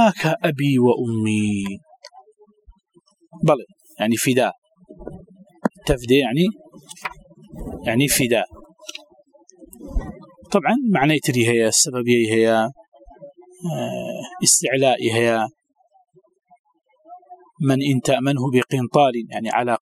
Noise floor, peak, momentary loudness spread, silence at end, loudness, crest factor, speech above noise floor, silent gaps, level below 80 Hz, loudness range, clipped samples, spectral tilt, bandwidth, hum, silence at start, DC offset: -59 dBFS; 0 dBFS; 19 LU; 0.05 s; -19 LUFS; 20 dB; 40 dB; 4.58-4.62 s, 16.59-16.64 s; -42 dBFS; 6 LU; under 0.1%; -4.5 dB/octave; 16.5 kHz; none; 0 s; under 0.1%